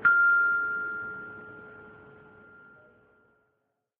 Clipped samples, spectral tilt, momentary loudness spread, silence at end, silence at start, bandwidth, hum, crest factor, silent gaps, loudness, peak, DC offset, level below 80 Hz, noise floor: under 0.1%; -7 dB/octave; 27 LU; 2.1 s; 0 s; 3.8 kHz; none; 18 dB; none; -25 LUFS; -12 dBFS; under 0.1%; -72 dBFS; -78 dBFS